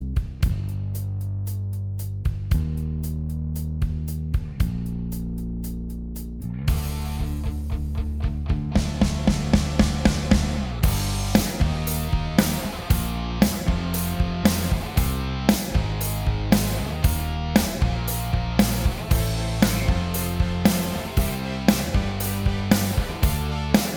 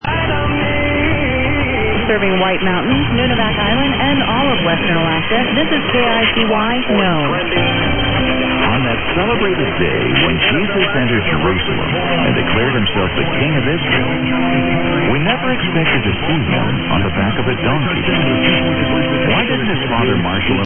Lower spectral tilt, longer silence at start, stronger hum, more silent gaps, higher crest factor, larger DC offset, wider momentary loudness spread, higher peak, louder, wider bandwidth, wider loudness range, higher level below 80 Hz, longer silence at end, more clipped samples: second, -5.5 dB/octave vs -10 dB/octave; about the same, 0 s vs 0.05 s; neither; neither; first, 22 dB vs 14 dB; neither; first, 8 LU vs 3 LU; about the same, -2 dBFS vs 0 dBFS; second, -24 LUFS vs -14 LUFS; first, over 20 kHz vs 3.6 kHz; first, 6 LU vs 1 LU; about the same, -28 dBFS vs -32 dBFS; about the same, 0 s vs 0 s; neither